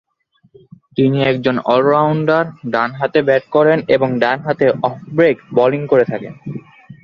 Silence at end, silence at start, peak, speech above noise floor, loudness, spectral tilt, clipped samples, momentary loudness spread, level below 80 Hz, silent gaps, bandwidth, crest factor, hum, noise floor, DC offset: 0.1 s; 0.95 s; -2 dBFS; 43 dB; -15 LUFS; -8.5 dB/octave; under 0.1%; 8 LU; -56 dBFS; none; 6.4 kHz; 14 dB; none; -58 dBFS; under 0.1%